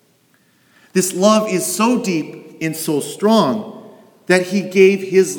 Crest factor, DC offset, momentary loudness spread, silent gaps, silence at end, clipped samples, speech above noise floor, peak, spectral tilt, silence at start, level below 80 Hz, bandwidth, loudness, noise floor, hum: 16 dB; under 0.1%; 12 LU; none; 0 s; under 0.1%; 42 dB; 0 dBFS; -4.5 dB/octave; 0.95 s; -70 dBFS; over 20 kHz; -16 LUFS; -57 dBFS; none